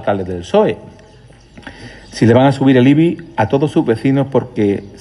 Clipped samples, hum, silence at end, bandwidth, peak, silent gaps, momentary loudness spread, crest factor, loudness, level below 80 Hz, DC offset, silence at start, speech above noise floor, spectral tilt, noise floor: under 0.1%; none; 0.1 s; 11.5 kHz; 0 dBFS; none; 12 LU; 14 dB; -14 LUFS; -48 dBFS; under 0.1%; 0 s; 29 dB; -7.5 dB/octave; -42 dBFS